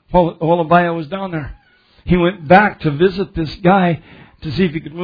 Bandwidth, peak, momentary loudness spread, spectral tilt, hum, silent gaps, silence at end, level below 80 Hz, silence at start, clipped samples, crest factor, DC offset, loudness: 5.4 kHz; 0 dBFS; 14 LU; -9 dB/octave; none; none; 0 s; -36 dBFS; 0.1 s; under 0.1%; 16 dB; under 0.1%; -15 LUFS